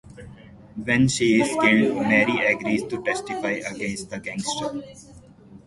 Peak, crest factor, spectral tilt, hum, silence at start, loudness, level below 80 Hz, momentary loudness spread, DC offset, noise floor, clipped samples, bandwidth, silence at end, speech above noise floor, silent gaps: -4 dBFS; 20 dB; -4.5 dB/octave; none; 0.05 s; -22 LUFS; -54 dBFS; 13 LU; under 0.1%; -47 dBFS; under 0.1%; 11.5 kHz; 0.1 s; 24 dB; none